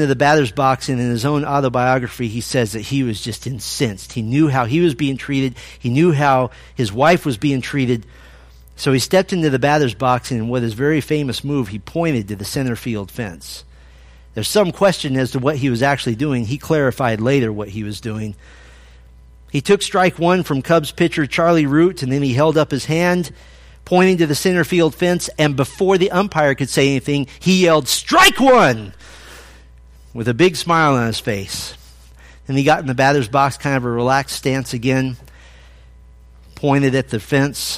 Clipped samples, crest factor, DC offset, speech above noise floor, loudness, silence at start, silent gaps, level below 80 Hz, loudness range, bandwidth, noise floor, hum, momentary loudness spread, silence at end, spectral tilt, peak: under 0.1%; 16 dB; under 0.1%; 27 dB; -17 LUFS; 0 s; none; -44 dBFS; 6 LU; 15.5 kHz; -43 dBFS; none; 11 LU; 0 s; -5.5 dB/octave; 0 dBFS